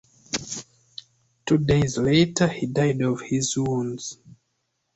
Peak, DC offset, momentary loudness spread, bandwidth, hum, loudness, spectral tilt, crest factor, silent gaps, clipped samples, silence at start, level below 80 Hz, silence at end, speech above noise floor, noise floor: -6 dBFS; under 0.1%; 18 LU; 8.2 kHz; none; -23 LUFS; -5 dB/octave; 18 dB; none; under 0.1%; 0.3 s; -50 dBFS; 0.65 s; 53 dB; -75 dBFS